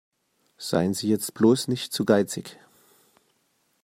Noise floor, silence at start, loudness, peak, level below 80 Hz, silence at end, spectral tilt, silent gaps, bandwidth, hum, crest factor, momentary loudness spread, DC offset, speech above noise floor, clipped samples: -70 dBFS; 0.6 s; -24 LUFS; -6 dBFS; -68 dBFS; 1.3 s; -5 dB/octave; none; 16 kHz; none; 20 dB; 14 LU; under 0.1%; 46 dB; under 0.1%